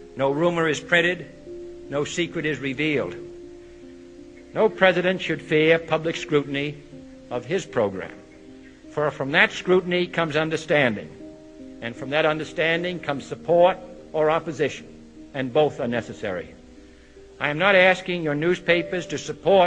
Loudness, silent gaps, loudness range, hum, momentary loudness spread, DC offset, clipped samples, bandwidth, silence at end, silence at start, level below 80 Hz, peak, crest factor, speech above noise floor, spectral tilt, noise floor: -22 LUFS; none; 5 LU; none; 20 LU; under 0.1%; under 0.1%; 9.8 kHz; 0 s; 0 s; -54 dBFS; -2 dBFS; 22 dB; 25 dB; -5 dB/octave; -47 dBFS